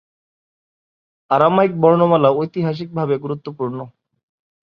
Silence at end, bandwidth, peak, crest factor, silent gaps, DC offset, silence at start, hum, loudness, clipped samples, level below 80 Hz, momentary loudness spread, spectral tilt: 0.8 s; 5.6 kHz; 0 dBFS; 18 dB; none; under 0.1%; 1.3 s; none; -17 LUFS; under 0.1%; -62 dBFS; 13 LU; -9.5 dB/octave